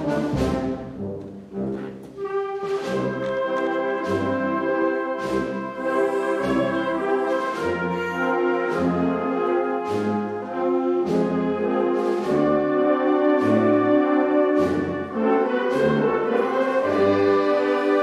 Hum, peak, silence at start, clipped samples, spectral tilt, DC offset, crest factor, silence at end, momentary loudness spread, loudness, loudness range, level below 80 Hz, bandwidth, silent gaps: none; -8 dBFS; 0 s; under 0.1%; -7 dB/octave; under 0.1%; 14 dB; 0 s; 8 LU; -22 LUFS; 6 LU; -50 dBFS; 12 kHz; none